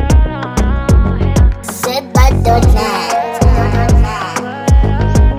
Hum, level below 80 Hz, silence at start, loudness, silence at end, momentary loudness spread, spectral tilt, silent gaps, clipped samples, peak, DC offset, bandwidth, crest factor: none; -14 dBFS; 0 s; -13 LUFS; 0 s; 7 LU; -6 dB/octave; none; under 0.1%; 0 dBFS; under 0.1%; 16 kHz; 10 dB